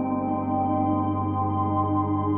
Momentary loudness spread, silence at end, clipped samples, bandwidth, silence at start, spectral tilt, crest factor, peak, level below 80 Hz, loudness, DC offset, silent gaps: 2 LU; 0 s; under 0.1%; 3.3 kHz; 0 s; -10 dB/octave; 12 dB; -12 dBFS; -56 dBFS; -25 LUFS; under 0.1%; none